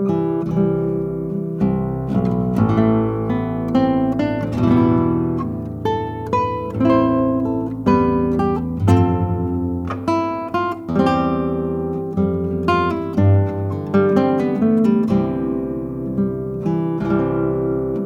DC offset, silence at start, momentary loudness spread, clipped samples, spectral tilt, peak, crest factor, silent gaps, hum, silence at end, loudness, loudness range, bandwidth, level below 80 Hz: under 0.1%; 0 s; 7 LU; under 0.1%; -9.5 dB/octave; -2 dBFS; 16 dB; none; none; 0 s; -19 LUFS; 2 LU; 8.6 kHz; -42 dBFS